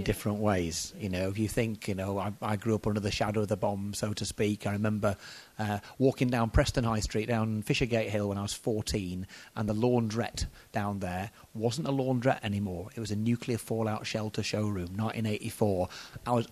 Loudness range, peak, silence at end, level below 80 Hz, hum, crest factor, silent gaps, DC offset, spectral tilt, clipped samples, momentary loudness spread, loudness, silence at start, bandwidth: 3 LU; -10 dBFS; 0 s; -46 dBFS; none; 20 dB; none; under 0.1%; -5.5 dB/octave; under 0.1%; 8 LU; -31 LUFS; 0 s; 14 kHz